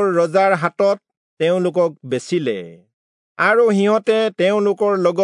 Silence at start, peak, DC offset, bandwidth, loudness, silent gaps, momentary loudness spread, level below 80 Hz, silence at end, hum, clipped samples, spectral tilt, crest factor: 0 s; -2 dBFS; under 0.1%; 11 kHz; -17 LUFS; 1.17-1.37 s, 2.93-3.35 s; 7 LU; -76 dBFS; 0 s; none; under 0.1%; -6 dB/octave; 14 dB